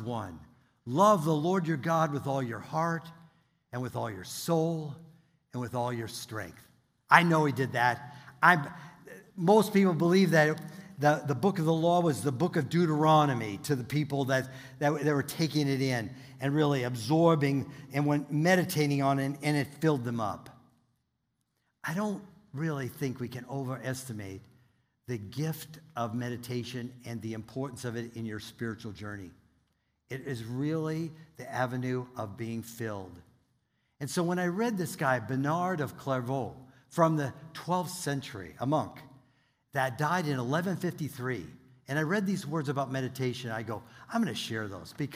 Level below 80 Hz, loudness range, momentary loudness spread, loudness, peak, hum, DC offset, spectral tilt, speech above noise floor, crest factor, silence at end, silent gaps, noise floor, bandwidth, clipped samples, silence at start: -68 dBFS; 11 LU; 16 LU; -30 LUFS; -4 dBFS; none; under 0.1%; -6 dB/octave; 50 dB; 26 dB; 0 s; none; -79 dBFS; 16 kHz; under 0.1%; 0 s